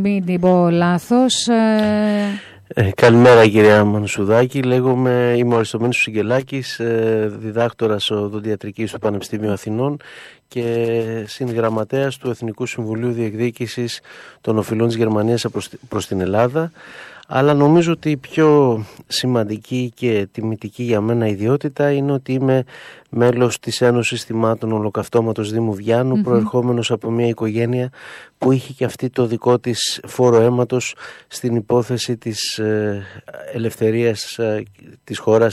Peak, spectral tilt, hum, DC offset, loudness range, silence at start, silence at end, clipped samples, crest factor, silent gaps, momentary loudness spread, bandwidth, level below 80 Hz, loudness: -2 dBFS; -6 dB/octave; none; under 0.1%; 8 LU; 0 s; 0 s; under 0.1%; 14 dB; none; 11 LU; 14 kHz; -58 dBFS; -18 LUFS